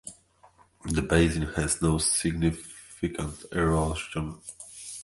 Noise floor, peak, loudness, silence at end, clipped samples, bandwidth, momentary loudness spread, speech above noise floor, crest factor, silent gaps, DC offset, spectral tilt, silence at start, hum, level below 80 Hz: -59 dBFS; -8 dBFS; -27 LUFS; 0 s; under 0.1%; 12 kHz; 18 LU; 32 dB; 22 dB; none; under 0.1%; -4.5 dB/octave; 0.05 s; none; -40 dBFS